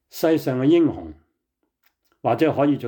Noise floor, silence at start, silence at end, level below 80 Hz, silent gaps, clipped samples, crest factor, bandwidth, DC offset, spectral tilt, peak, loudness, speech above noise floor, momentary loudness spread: -76 dBFS; 0.15 s; 0 s; -58 dBFS; none; under 0.1%; 14 dB; 19.5 kHz; under 0.1%; -7 dB/octave; -8 dBFS; -20 LUFS; 57 dB; 14 LU